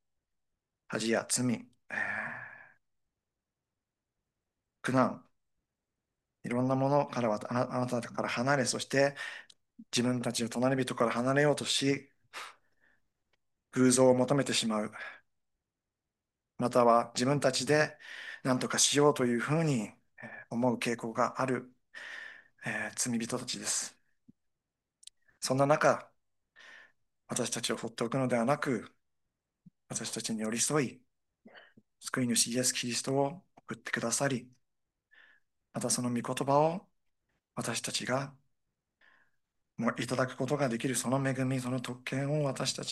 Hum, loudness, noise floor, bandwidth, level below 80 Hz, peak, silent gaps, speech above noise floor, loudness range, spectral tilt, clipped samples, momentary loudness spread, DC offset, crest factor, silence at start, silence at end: none; -31 LUFS; -89 dBFS; 12.5 kHz; -76 dBFS; -12 dBFS; none; 59 dB; 7 LU; -4 dB/octave; under 0.1%; 16 LU; under 0.1%; 22 dB; 0.9 s; 0 s